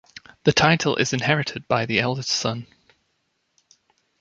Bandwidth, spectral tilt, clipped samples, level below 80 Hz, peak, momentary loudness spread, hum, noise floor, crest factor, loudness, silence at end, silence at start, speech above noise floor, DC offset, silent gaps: 9 kHz; -4 dB/octave; under 0.1%; -54 dBFS; -2 dBFS; 7 LU; none; -72 dBFS; 22 dB; -21 LUFS; 1.55 s; 0.45 s; 50 dB; under 0.1%; none